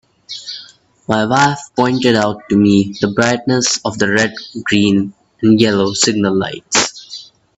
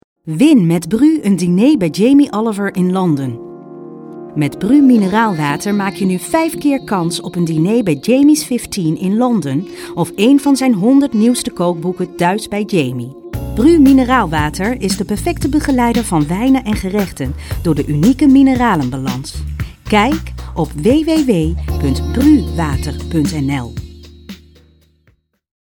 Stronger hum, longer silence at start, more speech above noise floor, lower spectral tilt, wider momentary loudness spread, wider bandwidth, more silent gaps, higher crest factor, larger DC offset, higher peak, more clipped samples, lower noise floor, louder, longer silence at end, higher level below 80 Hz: neither; about the same, 0.3 s vs 0.25 s; second, 28 dB vs 44 dB; second, -4 dB/octave vs -6 dB/octave; first, 16 LU vs 12 LU; second, 8.4 kHz vs 18.5 kHz; neither; about the same, 16 dB vs 14 dB; neither; about the same, 0 dBFS vs 0 dBFS; neither; second, -42 dBFS vs -56 dBFS; about the same, -14 LUFS vs -14 LUFS; second, 0.35 s vs 1.3 s; second, -52 dBFS vs -30 dBFS